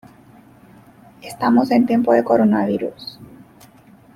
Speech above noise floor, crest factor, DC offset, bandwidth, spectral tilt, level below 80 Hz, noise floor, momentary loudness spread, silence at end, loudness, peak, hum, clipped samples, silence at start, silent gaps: 31 dB; 18 dB; under 0.1%; 13.5 kHz; -7 dB/octave; -60 dBFS; -48 dBFS; 20 LU; 0.9 s; -17 LUFS; -2 dBFS; none; under 0.1%; 1.25 s; none